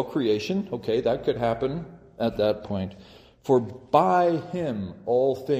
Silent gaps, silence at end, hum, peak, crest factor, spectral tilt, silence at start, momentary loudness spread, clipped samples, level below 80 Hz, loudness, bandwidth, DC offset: none; 0 s; none; -4 dBFS; 20 dB; -7 dB/octave; 0 s; 10 LU; under 0.1%; -56 dBFS; -25 LUFS; 15.5 kHz; under 0.1%